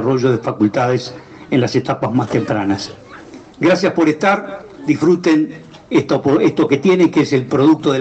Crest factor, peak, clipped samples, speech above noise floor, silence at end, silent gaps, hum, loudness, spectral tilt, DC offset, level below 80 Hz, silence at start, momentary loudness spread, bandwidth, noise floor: 14 dB; 0 dBFS; under 0.1%; 22 dB; 0 s; none; none; -15 LUFS; -6.5 dB/octave; under 0.1%; -54 dBFS; 0 s; 8 LU; 8.4 kHz; -37 dBFS